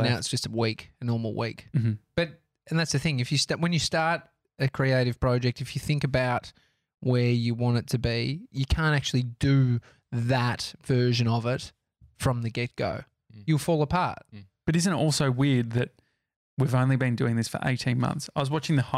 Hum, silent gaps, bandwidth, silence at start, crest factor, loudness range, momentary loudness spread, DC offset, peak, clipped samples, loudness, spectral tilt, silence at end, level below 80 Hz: none; 16.36-16.57 s; 14.5 kHz; 0 s; 16 dB; 2 LU; 8 LU; under 0.1%; -12 dBFS; under 0.1%; -27 LUFS; -5.5 dB/octave; 0 s; -46 dBFS